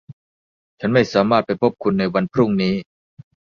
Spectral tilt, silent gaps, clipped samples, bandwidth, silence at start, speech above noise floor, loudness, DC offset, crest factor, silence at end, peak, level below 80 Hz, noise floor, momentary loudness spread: -7 dB/octave; 0.13-0.78 s; under 0.1%; 7 kHz; 0.1 s; over 72 dB; -19 LUFS; under 0.1%; 18 dB; 0.75 s; -2 dBFS; -54 dBFS; under -90 dBFS; 6 LU